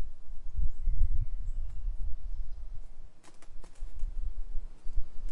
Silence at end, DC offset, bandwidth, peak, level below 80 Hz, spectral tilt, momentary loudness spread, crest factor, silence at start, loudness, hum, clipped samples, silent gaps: 0 s; under 0.1%; 1.1 kHz; -12 dBFS; -32 dBFS; -7 dB/octave; 19 LU; 14 dB; 0 s; -41 LUFS; none; under 0.1%; none